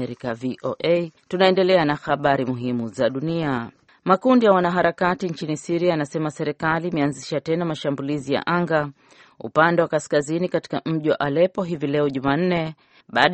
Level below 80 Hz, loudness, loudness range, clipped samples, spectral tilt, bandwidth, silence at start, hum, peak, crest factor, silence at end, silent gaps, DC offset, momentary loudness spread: -58 dBFS; -22 LUFS; 3 LU; under 0.1%; -6 dB/octave; 8.8 kHz; 0 s; none; 0 dBFS; 22 dB; 0 s; none; under 0.1%; 10 LU